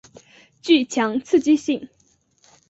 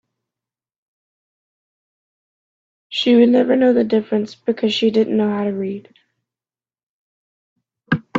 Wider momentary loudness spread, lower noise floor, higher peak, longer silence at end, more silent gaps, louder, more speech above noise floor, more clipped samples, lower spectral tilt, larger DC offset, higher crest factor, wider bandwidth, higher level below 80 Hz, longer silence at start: about the same, 10 LU vs 12 LU; second, -60 dBFS vs under -90 dBFS; about the same, -4 dBFS vs -2 dBFS; first, 0.85 s vs 0 s; second, none vs 6.83-7.56 s; second, -20 LUFS vs -17 LUFS; second, 41 dB vs over 74 dB; neither; second, -3.5 dB/octave vs -6.5 dB/octave; neither; about the same, 18 dB vs 18 dB; about the same, 8 kHz vs 7.4 kHz; about the same, -64 dBFS vs -62 dBFS; second, 0.65 s vs 2.9 s